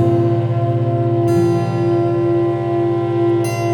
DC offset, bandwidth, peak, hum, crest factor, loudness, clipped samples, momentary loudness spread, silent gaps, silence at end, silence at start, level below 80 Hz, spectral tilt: under 0.1%; 16.5 kHz; -4 dBFS; none; 12 dB; -17 LUFS; under 0.1%; 3 LU; none; 0 s; 0 s; -52 dBFS; -8.5 dB/octave